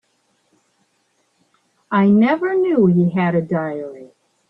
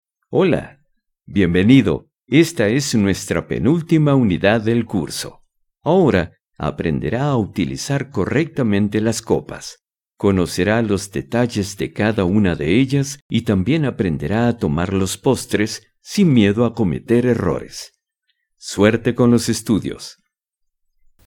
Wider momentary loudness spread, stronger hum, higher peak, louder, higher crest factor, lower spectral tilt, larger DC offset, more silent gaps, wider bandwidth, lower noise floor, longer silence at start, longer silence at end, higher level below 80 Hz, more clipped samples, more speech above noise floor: about the same, 12 LU vs 11 LU; neither; about the same, -2 dBFS vs 0 dBFS; about the same, -17 LUFS vs -18 LUFS; about the same, 16 dB vs 18 dB; first, -10 dB/octave vs -6 dB/octave; neither; second, none vs 13.21-13.29 s; second, 4.5 kHz vs 18 kHz; second, -65 dBFS vs -73 dBFS; first, 1.9 s vs 0.3 s; second, 0.45 s vs 1.15 s; second, -62 dBFS vs -44 dBFS; neither; second, 49 dB vs 56 dB